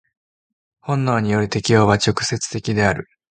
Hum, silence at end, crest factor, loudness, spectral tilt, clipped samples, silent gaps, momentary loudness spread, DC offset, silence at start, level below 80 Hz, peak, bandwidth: none; 0.25 s; 20 dB; -19 LUFS; -5 dB/octave; under 0.1%; none; 9 LU; under 0.1%; 0.85 s; -46 dBFS; 0 dBFS; 9.4 kHz